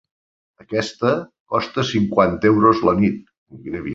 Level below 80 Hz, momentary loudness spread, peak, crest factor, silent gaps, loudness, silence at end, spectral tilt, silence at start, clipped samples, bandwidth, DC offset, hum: -48 dBFS; 14 LU; -2 dBFS; 18 dB; 1.40-1.46 s, 3.38-3.46 s; -19 LUFS; 0 s; -6.5 dB/octave; 0.7 s; under 0.1%; 8 kHz; under 0.1%; none